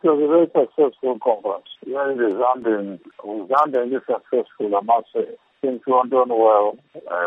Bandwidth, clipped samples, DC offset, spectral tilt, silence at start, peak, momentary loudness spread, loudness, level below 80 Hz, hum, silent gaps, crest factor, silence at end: 5.2 kHz; under 0.1%; under 0.1%; -8 dB/octave; 0.05 s; -4 dBFS; 13 LU; -20 LUFS; -78 dBFS; none; none; 16 dB; 0 s